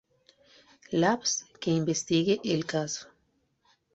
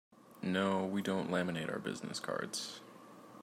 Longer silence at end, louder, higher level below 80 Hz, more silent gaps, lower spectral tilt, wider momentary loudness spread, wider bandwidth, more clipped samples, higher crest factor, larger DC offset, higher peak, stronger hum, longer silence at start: first, 0.9 s vs 0 s; first, -28 LUFS vs -37 LUFS; first, -66 dBFS vs -80 dBFS; neither; about the same, -4 dB/octave vs -5 dB/octave; second, 7 LU vs 18 LU; second, 8.2 kHz vs 15.5 kHz; neither; about the same, 20 dB vs 18 dB; neither; first, -10 dBFS vs -20 dBFS; neither; first, 0.9 s vs 0.25 s